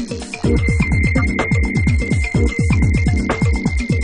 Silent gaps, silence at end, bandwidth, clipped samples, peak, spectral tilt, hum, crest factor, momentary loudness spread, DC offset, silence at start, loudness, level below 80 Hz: none; 0 s; 10.5 kHz; under 0.1%; -2 dBFS; -6.5 dB/octave; none; 12 dB; 3 LU; under 0.1%; 0 s; -17 LUFS; -22 dBFS